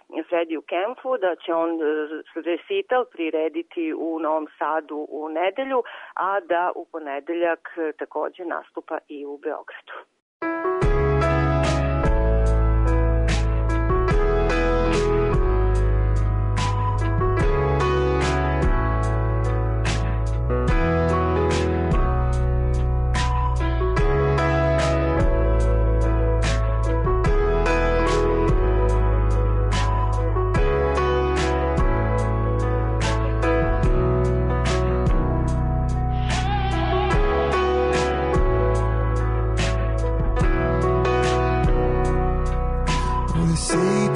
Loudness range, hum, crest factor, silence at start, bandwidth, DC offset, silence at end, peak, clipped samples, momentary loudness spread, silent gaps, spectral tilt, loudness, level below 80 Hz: 5 LU; none; 10 dB; 0.1 s; 11 kHz; under 0.1%; 0 s; -10 dBFS; under 0.1%; 7 LU; 10.22-10.40 s; -6.5 dB/octave; -22 LUFS; -24 dBFS